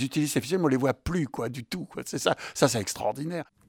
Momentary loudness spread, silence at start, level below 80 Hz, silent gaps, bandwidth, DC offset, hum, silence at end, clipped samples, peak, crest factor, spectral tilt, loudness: 10 LU; 0 s; -50 dBFS; none; 19.5 kHz; under 0.1%; none; 0.25 s; under 0.1%; -6 dBFS; 22 dB; -4.5 dB/octave; -28 LUFS